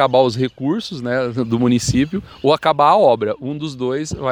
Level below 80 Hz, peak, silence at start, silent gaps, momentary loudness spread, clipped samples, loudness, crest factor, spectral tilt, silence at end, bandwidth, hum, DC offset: -44 dBFS; 0 dBFS; 0 s; none; 10 LU; under 0.1%; -17 LUFS; 16 dB; -5.5 dB/octave; 0 s; over 20 kHz; none; under 0.1%